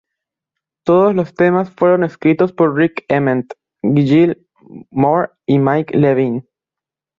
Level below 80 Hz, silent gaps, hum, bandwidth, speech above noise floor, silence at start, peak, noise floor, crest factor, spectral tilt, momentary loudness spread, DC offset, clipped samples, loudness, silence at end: -54 dBFS; none; none; 7 kHz; 73 dB; 0.85 s; -2 dBFS; -87 dBFS; 14 dB; -9.5 dB/octave; 9 LU; under 0.1%; under 0.1%; -15 LUFS; 0.8 s